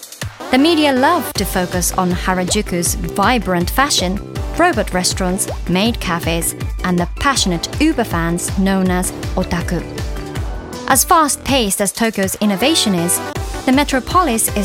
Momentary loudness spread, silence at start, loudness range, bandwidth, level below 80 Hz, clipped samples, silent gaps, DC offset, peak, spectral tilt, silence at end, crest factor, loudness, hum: 9 LU; 0 s; 2 LU; 18 kHz; -28 dBFS; under 0.1%; none; under 0.1%; 0 dBFS; -3.5 dB/octave; 0 s; 16 dB; -16 LUFS; none